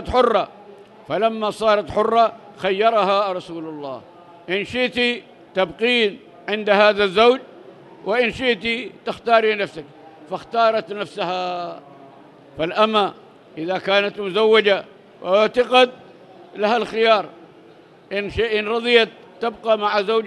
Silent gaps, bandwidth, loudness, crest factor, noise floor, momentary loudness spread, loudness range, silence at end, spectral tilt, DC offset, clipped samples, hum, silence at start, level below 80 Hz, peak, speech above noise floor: none; 11.5 kHz; -19 LUFS; 20 dB; -47 dBFS; 15 LU; 4 LU; 0 s; -4.5 dB/octave; under 0.1%; under 0.1%; none; 0 s; -52 dBFS; 0 dBFS; 28 dB